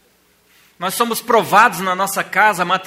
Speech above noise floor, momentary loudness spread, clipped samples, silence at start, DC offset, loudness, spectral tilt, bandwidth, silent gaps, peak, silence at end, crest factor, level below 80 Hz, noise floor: 41 dB; 8 LU; under 0.1%; 0.8 s; under 0.1%; -15 LUFS; -3 dB/octave; 16.5 kHz; none; 0 dBFS; 0 s; 18 dB; -64 dBFS; -56 dBFS